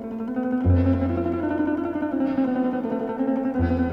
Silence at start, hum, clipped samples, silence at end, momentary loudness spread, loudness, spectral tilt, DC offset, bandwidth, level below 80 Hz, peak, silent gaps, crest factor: 0 s; none; under 0.1%; 0 s; 6 LU; -24 LUFS; -10.5 dB/octave; under 0.1%; 5.4 kHz; -46 dBFS; -10 dBFS; none; 12 dB